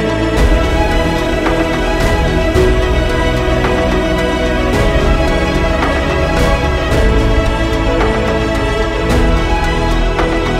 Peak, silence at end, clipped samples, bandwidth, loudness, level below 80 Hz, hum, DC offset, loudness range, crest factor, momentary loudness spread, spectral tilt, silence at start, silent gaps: 0 dBFS; 0 s; under 0.1%; 15 kHz; -14 LUFS; -16 dBFS; none; under 0.1%; 1 LU; 12 dB; 2 LU; -6 dB/octave; 0 s; none